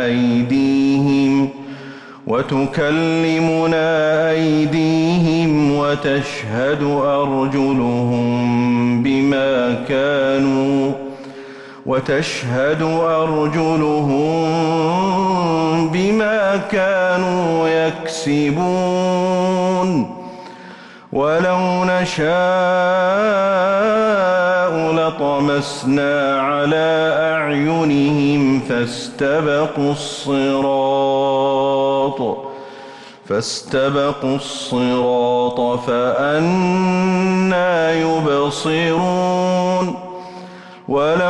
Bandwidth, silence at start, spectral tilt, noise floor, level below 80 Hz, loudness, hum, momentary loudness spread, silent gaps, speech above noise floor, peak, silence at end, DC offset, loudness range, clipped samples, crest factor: 11.5 kHz; 0 s; -6 dB/octave; -38 dBFS; -52 dBFS; -17 LUFS; none; 7 LU; none; 22 dB; -8 dBFS; 0 s; under 0.1%; 3 LU; under 0.1%; 8 dB